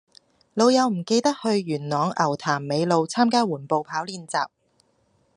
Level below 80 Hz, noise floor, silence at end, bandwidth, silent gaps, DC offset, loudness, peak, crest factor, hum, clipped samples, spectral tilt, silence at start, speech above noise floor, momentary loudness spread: -72 dBFS; -65 dBFS; 0.9 s; 11 kHz; none; under 0.1%; -23 LUFS; -6 dBFS; 18 dB; none; under 0.1%; -5 dB/octave; 0.55 s; 43 dB; 9 LU